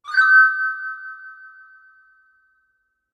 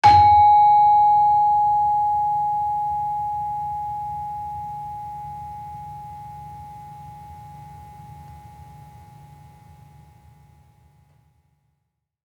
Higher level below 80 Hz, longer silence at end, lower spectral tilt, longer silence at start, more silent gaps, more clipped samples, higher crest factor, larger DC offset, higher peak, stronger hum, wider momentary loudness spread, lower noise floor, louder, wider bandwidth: second, -80 dBFS vs -50 dBFS; second, 1.8 s vs 3.5 s; second, 3 dB/octave vs -5 dB/octave; about the same, 0.05 s vs 0.05 s; neither; neither; about the same, 18 dB vs 18 dB; neither; about the same, -4 dBFS vs -2 dBFS; neither; about the same, 26 LU vs 28 LU; second, -70 dBFS vs -76 dBFS; first, -15 LUFS vs -18 LUFS; about the same, 8.2 kHz vs 7.8 kHz